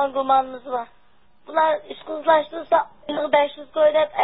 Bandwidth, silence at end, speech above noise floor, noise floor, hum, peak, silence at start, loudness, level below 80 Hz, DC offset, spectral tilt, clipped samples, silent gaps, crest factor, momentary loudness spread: 4.1 kHz; 0 s; 40 dB; -61 dBFS; none; -4 dBFS; 0 s; -21 LUFS; -64 dBFS; 0.3%; -8 dB/octave; under 0.1%; none; 18 dB; 11 LU